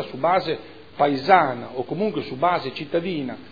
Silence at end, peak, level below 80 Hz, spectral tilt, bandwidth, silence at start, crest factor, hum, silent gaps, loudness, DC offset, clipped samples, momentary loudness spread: 0 s; 0 dBFS; -66 dBFS; -7.5 dB/octave; 5 kHz; 0 s; 22 dB; none; none; -22 LUFS; 0.4%; under 0.1%; 12 LU